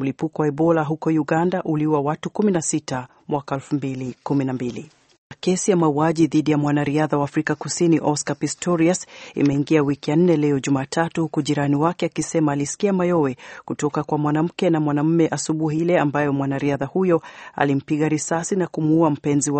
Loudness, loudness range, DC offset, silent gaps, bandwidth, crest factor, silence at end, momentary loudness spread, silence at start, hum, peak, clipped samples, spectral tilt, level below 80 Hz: -21 LUFS; 3 LU; under 0.1%; 5.18-5.30 s; 8.8 kHz; 18 dB; 0 s; 7 LU; 0 s; none; -2 dBFS; under 0.1%; -6 dB/octave; -58 dBFS